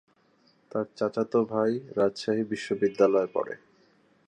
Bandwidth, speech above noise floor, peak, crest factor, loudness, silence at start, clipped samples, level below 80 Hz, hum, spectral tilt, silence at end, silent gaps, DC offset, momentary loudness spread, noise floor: 9.8 kHz; 38 dB; -8 dBFS; 20 dB; -28 LUFS; 0.75 s; under 0.1%; -72 dBFS; none; -6.5 dB/octave; 0.7 s; none; under 0.1%; 10 LU; -65 dBFS